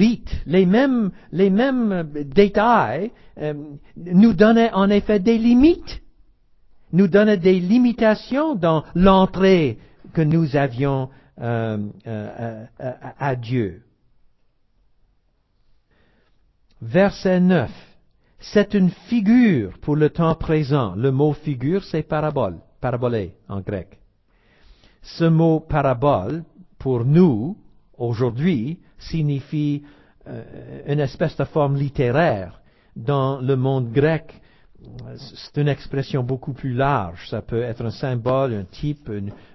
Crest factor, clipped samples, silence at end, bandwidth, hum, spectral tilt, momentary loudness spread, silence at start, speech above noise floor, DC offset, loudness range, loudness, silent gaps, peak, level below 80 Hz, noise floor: 20 dB; under 0.1%; 0.2 s; 6 kHz; none; -8.5 dB/octave; 16 LU; 0 s; 44 dB; under 0.1%; 9 LU; -20 LUFS; none; 0 dBFS; -42 dBFS; -63 dBFS